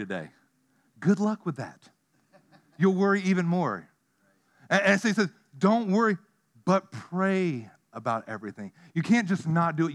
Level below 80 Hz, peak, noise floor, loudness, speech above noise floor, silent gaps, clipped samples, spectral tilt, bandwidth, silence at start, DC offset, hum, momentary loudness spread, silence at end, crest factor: -82 dBFS; -6 dBFS; -69 dBFS; -26 LUFS; 43 dB; none; under 0.1%; -6.5 dB/octave; 10.5 kHz; 0 s; under 0.1%; none; 15 LU; 0 s; 22 dB